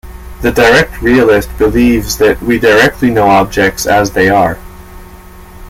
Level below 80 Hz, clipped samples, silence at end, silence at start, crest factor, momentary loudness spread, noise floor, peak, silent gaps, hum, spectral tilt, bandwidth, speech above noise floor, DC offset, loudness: -28 dBFS; under 0.1%; 0 s; 0.05 s; 10 dB; 5 LU; -32 dBFS; 0 dBFS; none; none; -5 dB/octave; 16.5 kHz; 24 dB; under 0.1%; -9 LUFS